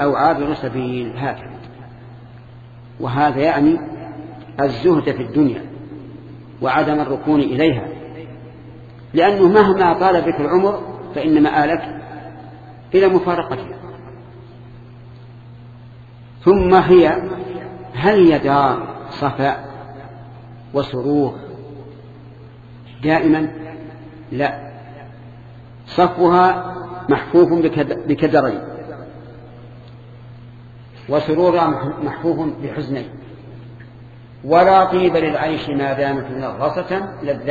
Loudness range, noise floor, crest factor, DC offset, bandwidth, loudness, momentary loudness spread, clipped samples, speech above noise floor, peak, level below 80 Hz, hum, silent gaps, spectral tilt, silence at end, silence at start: 8 LU; -39 dBFS; 18 dB; under 0.1%; 7 kHz; -17 LUFS; 25 LU; under 0.1%; 24 dB; 0 dBFS; -46 dBFS; none; none; -8.5 dB/octave; 0 s; 0 s